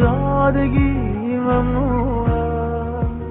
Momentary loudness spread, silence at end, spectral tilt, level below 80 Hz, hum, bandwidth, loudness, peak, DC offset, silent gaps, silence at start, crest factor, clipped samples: 6 LU; 0 s; -8.5 dB/octave; -26 dBFS; none; 3.9 kHz; -19 LUFS; -4 dBFS; under 0.1%; none; 0 s; 14 dB; under 0.1%